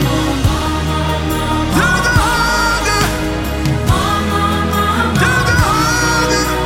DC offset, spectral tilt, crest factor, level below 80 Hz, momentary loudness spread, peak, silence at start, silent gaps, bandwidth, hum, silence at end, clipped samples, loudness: under 0.1%; -4.5 dB/octave; 12 dB; -24 dBFS; 5 LU; -2 dBFS; 0 s; none; 17 kHz; none; 0 s; under 0.1%; -14 LUFS